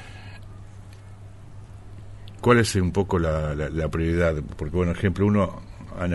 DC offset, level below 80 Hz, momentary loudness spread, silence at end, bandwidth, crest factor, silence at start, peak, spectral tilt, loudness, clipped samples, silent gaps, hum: under 0.1%; -38 dBFS; 24 LU; 0 s; 11.5 kHz; 20 dB; 0 s; -4 dBFS; -6.5 dB/octave; -23 LUFS; under 0.1%; none; none